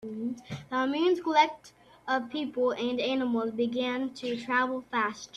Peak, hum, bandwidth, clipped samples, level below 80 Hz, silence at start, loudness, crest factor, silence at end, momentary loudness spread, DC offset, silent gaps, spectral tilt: -10 dBFS; none; 11.5 kHz; under 0.1%; -70 dBFS; 0 s; -29 LUFS; 20 dB; 0 s; 11 LU; under 0.1%; none; -4.5 dB/octave